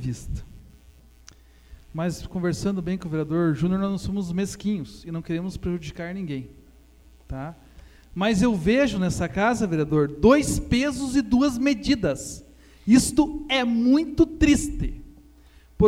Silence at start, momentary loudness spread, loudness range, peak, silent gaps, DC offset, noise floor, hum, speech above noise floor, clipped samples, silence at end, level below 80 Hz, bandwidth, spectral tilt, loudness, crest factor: 0 s; 15 LU; 9 LU; -4 dBFS; none; under 0.1%; -52 dBFS; none; 29 dB; under 0.1%; 0 s; -40 dBFS; 15.5 kHz; -5.5 dB/octave; -23 LUFS; 20 dB